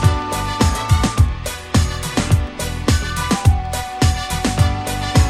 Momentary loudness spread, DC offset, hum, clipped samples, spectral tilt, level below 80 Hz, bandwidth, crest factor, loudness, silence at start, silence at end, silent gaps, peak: 5 LU; under 0.1%; none; under 0.1%; -5 dB/octave; -24 dBFS; 15 kHz; 16 dB; -18 LUFS; 0 s; 0 s; none; 0 dBFS